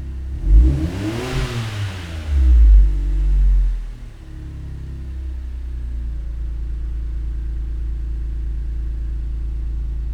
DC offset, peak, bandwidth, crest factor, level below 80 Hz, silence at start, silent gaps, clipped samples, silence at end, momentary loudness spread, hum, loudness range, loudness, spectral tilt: under 0.1%; -2 dBFS; 8 kHz; 16 dB; -18 dBFS; 0 s; none; under 0.1%; 0 s; 16 LU; none; 11 LU; -22 LUFS; -7 dB/octave